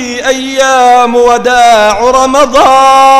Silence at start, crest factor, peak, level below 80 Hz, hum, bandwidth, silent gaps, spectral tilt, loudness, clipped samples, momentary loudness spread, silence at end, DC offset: 0 s; 6 dB; 0 dBFS; -34 dBFS; none; 16 kHz; none; -2 dB/octave; -6 LUFS; 3%; 6 LU; 0 s; under 0.1%